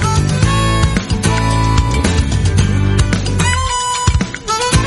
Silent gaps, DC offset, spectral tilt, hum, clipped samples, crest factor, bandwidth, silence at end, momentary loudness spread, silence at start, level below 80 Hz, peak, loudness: none; under 0.1%; -4.5 dB/octave; none; under 0.1%; 14 dB; 11.5 kHz; 0 s; 2 LU; 0 s; -20 dBFS; 0 dBFS; -14 LUFS